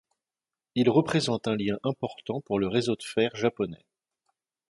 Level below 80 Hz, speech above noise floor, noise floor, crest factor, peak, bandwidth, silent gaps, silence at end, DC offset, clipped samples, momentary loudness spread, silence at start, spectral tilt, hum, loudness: -62 dBFS; over 63 dB; under -90 dBFS; 20 dB; -8 dBFS; 11.5 kHz; none; 0.95 s; under 0.1%; under 0.1%; 11 LU; 0.75 s; -6 dB/octave; none; -28 LUFS